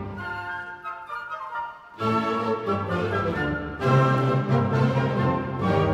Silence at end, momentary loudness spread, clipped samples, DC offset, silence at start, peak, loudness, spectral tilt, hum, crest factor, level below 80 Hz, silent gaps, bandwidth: 0 s; 12 LU; under 0.1%; under 0.1%; 0 s; -10 dBFS; -25 LUFS; -8 dB/octave; none; 16 dB; -48 dBFS; none; 8 kHz